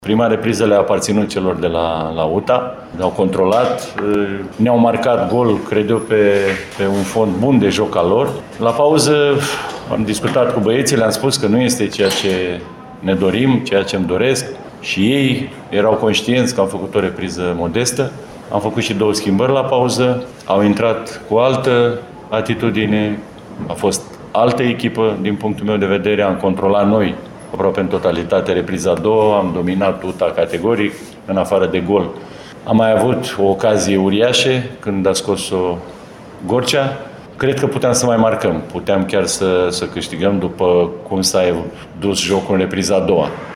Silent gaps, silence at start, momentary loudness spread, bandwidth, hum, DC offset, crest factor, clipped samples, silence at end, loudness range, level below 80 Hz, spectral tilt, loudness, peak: none; 0 s; 8 LU; 16.5 kHz; none; under 0.1%; 14 dB; under 0.1%; 0 s; 3 LU; -46 dBFS; -5 dB/octave; -16 LUFS; -2 dBFS